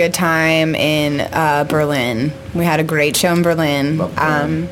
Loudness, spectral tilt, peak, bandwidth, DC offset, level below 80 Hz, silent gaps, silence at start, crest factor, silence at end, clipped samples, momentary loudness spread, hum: -16 LUFS; -5 dB/octave; -2 dBFS; 17 kHz; under 0.1%; -44 dBFS; none; 0 s; 14 dB; 0 s; under 0.1%; 4 LU; none